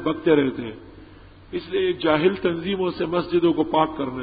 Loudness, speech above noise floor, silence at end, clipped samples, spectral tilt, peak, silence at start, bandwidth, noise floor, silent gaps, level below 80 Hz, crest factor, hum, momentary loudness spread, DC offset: -22 LUFS; 24 dB; 0 s; under 0.1%; -11 dB/octave; -4 dBFS; 0 s; 5 kHz; -45 dBFS; none; -50 dBFS; 18 dB; none; 14 LU; under 0.1%